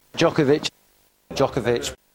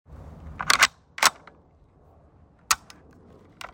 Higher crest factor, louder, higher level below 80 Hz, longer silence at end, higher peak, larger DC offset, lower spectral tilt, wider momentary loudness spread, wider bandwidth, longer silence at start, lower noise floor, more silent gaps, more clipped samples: second, 18 dB vs 28 dB; about the same, -22 LUFS vs -22 LUFS; about the same, -50 dBFS vs -54 dBFS; first, 0.2 s vs 0.05 s; about the same, -4 dBFS vs -2 dBFS; neither; first, -5 dB/octave vs 0.5 dB/octave; second, 9 LU vs 24 LU; about the same, 16.5 kHz vs 16.5 kHz; about the same, 0.15 s vs 0.1 s; first, -61 dBFS vs -57 dBFS; neither; neither